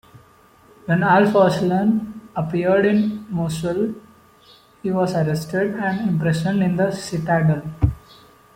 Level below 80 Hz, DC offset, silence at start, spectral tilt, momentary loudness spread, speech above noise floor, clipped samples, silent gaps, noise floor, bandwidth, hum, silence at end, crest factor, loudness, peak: -42 dBFS; under 0.1%; 0.15 s; -7.5 dB/octave; 10 LU; 33 dB; under 0.1%; none; -51 dBFS; 16 kHz; none; 0.6 s; 16 dB; -20 LUFS; -4 dBFS